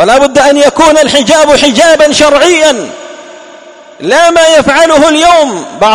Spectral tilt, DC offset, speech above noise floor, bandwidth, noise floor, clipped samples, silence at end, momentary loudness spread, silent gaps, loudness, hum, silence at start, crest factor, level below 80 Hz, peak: -2.5 dB/octave; under 0.1%; 26 dB; 16 kHz; -31 dBFS; 6%; 0 s; 7 LU; none; -5 LUFS; none; 0 s; 6 dB; -36 dBFS; 0 dBFS